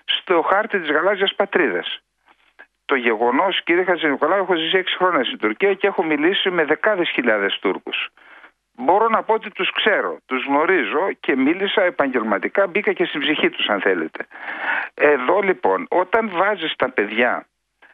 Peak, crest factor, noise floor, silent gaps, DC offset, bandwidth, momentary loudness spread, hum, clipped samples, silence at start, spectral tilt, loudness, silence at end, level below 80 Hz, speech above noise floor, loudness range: -2 dBFS; 18 dB; -58 dBFS; none; under 0.1%; 4.7 kHz; 6 LU; none; under 0.1%; 0.1 s; -7 dB/octave; -19 LUFS; 0.5 s; -66 dBFS; 39 dB; 2 LU